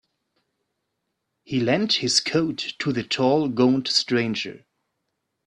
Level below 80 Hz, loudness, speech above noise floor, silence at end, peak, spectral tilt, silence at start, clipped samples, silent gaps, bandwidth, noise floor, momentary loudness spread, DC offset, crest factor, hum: -64 dBFS; -22 LUFS; 56 dB; 0.9 s; -4 dBFS; -4 dB/octave; 1.5 s; under 0.1%; none; 11 kHz; -78 dBFS; 8 LU; under 0.1%; 20 dB; none